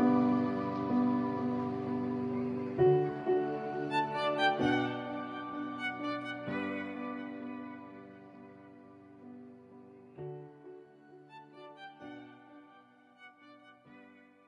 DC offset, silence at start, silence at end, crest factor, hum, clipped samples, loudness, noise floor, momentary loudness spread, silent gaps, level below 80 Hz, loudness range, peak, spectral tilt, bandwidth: under 0.1%; 0 s; 0.35 s; 18 dB; none; under 0.1%; -33 LUFS; -61 dBFS; 25 LU; none; -72 dBFS; 20 LU; -16 dBFS; -7.5 dB/octave; 9.6 kHz